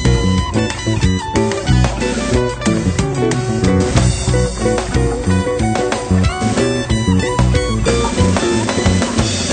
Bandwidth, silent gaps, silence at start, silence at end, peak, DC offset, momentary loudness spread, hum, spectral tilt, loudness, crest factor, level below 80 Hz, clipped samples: 9.4 kHz; none; 0 s; 0 s; 0 dBFS; under 0.1%; 2 LU; none; -5.5 dB/octave; -16 LUFS; 14 dB; -24 dBFS; under 0.1%